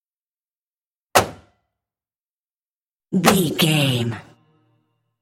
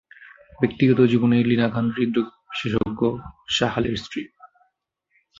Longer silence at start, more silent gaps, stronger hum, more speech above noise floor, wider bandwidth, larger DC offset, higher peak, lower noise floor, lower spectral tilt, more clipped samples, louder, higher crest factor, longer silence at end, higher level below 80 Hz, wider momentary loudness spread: first, 1.15 s vs 0.6 s; first, 2.21-2.45 s, 2.51-3.00 s vs none; neither; first, over 72 dB vs 51 dB; first, 16.5 kHz vs 7.6 kHz; neither; first, 0 dBFS vs -4 dBFS; first, under -90 dBFS vs -72 dBFS; second, -4.5 dB/octave vs -6.5 dB/octave; neither; first, -19 LUFS vs -22 LUFS; first, 24 dB vs 18 dB; about the same, 1 s vs 0.95 s; second, -56 dBFS vs -50 dBFS; about the same, 12 LU vs 12 LU